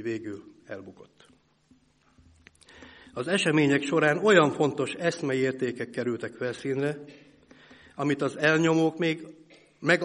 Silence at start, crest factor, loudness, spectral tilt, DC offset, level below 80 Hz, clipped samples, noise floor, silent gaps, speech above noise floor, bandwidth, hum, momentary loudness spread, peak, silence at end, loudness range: 0 s; 22 dB; -26 LUFS; -5.5 dB/octave; under 0.1%; -68 dBFS; under 0.1%; -63 dBFS; none; 37 dB; 11.5 kHz; none; 21 LU; -6 dBFS; 0 s; 7 LU